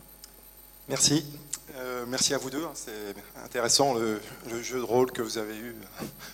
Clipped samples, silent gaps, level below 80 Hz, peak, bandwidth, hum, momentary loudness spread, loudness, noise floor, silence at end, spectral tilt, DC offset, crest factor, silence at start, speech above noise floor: under 0.1%; none; -60 dBFS; -8 dBFS; 17 kHz; none; 20 LU; -28 LUFS; -52 dBFS; 0 s; -2.5 dB/octave; under 0.1%; 24 dB; 0 s; 22 dB